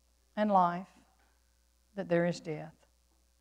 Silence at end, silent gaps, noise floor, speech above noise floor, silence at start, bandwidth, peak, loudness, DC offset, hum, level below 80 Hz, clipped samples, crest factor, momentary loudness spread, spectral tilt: 0.7 s; none; -70 dBFS; 40 dB; 0.35 s; 10 kHz; -14 dBFS; -32 LUFS; under 0.1%; none; -70 dBFS; under 0.1%; 20 dB; 20 LU; -7 dB/octave